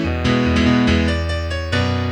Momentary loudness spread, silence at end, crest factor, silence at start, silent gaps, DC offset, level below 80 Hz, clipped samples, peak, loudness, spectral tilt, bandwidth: 7 LU; 0 s; 14 dB; 0 s; none; under 0.1%; -28 dBFS; under 0.1%; -4 dBFS; -18 LUFS; -6.5 dB/octave; 9.4 kHz